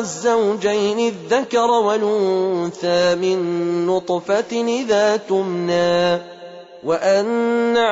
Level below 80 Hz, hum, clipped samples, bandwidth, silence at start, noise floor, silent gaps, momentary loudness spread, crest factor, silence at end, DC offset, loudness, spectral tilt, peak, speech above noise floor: -62 dBFS; none; under 0.1%; 8 kHz; 0 s; -38 dBFS; none; 5 LU; 12 dB; 0 s; under 0.1%; -18 LUFS; -4.5 dB/octave; -6 dBFS; 20 dB